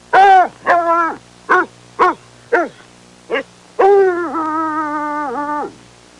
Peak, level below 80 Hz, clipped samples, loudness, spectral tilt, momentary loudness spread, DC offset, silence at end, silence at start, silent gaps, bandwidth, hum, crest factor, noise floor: -2 dBFS; -58 dBFS; under 0.1%; -15 LUFS; -4.5 dB/octave; 14 LU; under 0.1%; 0.5 s; 0.1 s; none; 11 kHz; none; 12 dB; -43 dBFS